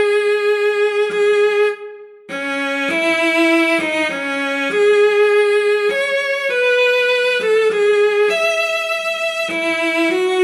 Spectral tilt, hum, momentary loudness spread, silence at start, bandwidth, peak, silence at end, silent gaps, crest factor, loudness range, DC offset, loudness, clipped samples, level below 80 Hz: -2.5 dB/octave; none; 6 LU; 0 s; 13 kHz; -4 dBFS; 0 s; none; 12 dB; 2 LU; under 0.1%; -15 LUFS; under 0.1%; -82 dBFS